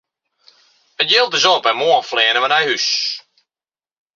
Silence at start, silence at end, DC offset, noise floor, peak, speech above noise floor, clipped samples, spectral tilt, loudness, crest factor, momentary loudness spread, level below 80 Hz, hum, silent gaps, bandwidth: 1 s; 0.95 s; under 0.1%; under -90 dBFS; 0 dBFS; over 74 dB; under 0.1%; -0.5 dB/octave; -14 LUFS; 18 dB; 7 LU; -72 dBFS; none; none; 7.6 kHz